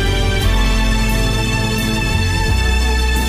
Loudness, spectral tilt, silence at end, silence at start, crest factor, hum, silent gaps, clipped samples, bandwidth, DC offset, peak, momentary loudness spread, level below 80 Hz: -16 LUFS; -4.5 dB/octave; 0 s; 0 s; 10 dB; none; none; under 0.1%; 16 kHz; under 0.1%; -4 dBFS; 1 LU; -18 dBFS